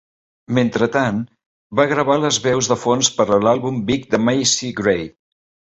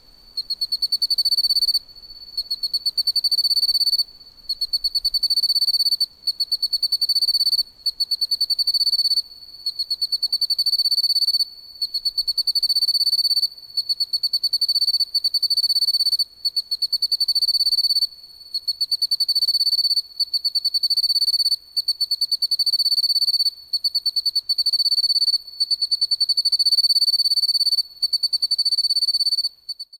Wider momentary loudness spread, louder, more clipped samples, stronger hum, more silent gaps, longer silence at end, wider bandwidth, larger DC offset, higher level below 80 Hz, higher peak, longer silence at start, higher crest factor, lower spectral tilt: about the same, 7 LU vs 7 LU; about the same, -18 LUFS vs -18 LUFS; neither; neither; first, 1.46-1.70 s vs none; first, 0.6 s vs 0.05 s; second, 8.4 kHz vs 19 kHz; neither; first, -52 dBFS vs -60 dBFS; first, -2 dBFS vs -10 dBFS; first, 0.5 s vs 0.35 s; about the same, 16 dB vs 12 dB; first, -4 dB/octave vs 3 dB/octave